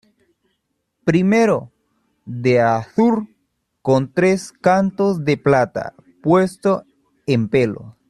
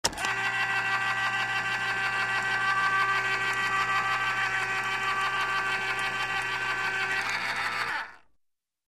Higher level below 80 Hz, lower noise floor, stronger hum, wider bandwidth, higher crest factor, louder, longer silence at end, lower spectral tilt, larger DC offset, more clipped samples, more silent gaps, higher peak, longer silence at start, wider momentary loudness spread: about the same, -56 dBFS vs -60 dBFS; about the same, -72 dBFS vs -75 dBFS; neither; second, 12 kHz vs 15.5 kHz; second, 16 dB vs 22 dB; first, -18 LUFS vs -27 LUFS; second, 0.2 s vs 0.75 s; first, -7 dB/octave vs -1.5 dB/octave; second, under 0.1% vs 0.1%; neither; neither; first, -2 dBFS vs -6 dBFS; first, 1.05 s vs 0.05 s; first, 10 LU vs 4 LU